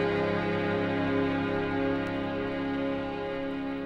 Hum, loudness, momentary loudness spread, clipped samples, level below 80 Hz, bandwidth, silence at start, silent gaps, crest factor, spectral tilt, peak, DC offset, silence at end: none; -30 LUFS; 5 LU; under 0.1%; -52 dBFS; 7.2 kHz; 0 s; none; 14 dB; -8 dB/octave; -16 dBFS; under 0.1%; 0 s